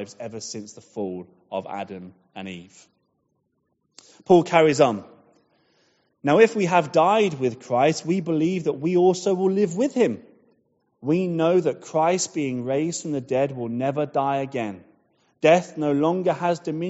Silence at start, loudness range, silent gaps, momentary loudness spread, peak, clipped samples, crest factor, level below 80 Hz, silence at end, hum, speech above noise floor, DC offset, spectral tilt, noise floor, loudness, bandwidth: 0 s; 8 LU; none; 16 LU; -2 dBFS; under 0.1%; 20 dB; -70 dBFS; 0 s; none; 50 dB; under 0.1%; -5.5 dB/octave; -72 dBFS; -22 LUFS; 8 kHz